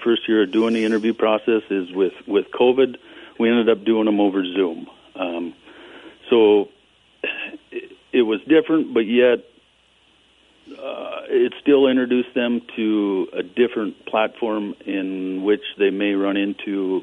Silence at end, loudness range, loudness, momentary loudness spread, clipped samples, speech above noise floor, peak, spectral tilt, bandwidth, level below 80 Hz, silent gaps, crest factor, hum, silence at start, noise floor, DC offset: 0 s; 3 LU; -20 LUFS; 13 LU; under 0.1%; 39 dB; -4 dBFS; -6.5 dB/octave; 9.4 kHz; -68 dBFS; none; 16 dB; none; 0 s; -58 dBFS; under 0.1%